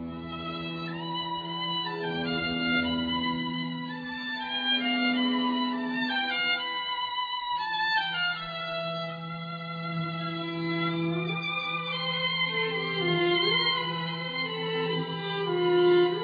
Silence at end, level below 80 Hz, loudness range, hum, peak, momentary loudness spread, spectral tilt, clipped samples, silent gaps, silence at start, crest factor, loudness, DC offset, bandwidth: 0 s; -62 dBFS; 4 LU; none; -14 dBFS; 10 LU; -7 dB/octave; under 0.1%; none; 0 s; 14 dB; -28 LUFS; under 0.1%; 5 kHz